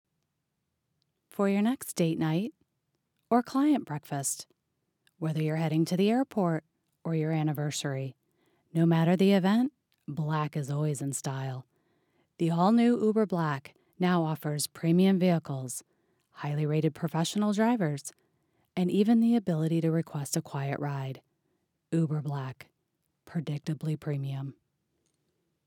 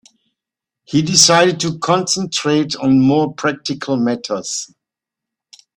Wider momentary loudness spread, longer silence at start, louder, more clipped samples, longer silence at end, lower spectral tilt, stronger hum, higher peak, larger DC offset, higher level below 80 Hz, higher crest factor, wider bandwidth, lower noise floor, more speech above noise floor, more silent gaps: about the same, 14 LU vs 12 LU; first, 1.4 s vs 0.9 s; second, -29 LUFS vs -15 LUFS; neither; about the same, 1.15 s vs 1.15 s; first, -6.5 dB/octave vs -3.5 dB/octave; neither; second, -12 dBFS vs 0 dBFS; neither; second, -80 dBFS vs -54 dBFS; about the same, 18 dB vs 18 dB; first, 18 kHz vs 16 kHz; about the same, -82 dBFS vs -84 dBFS; second, 54 dB vs 69 dB; neither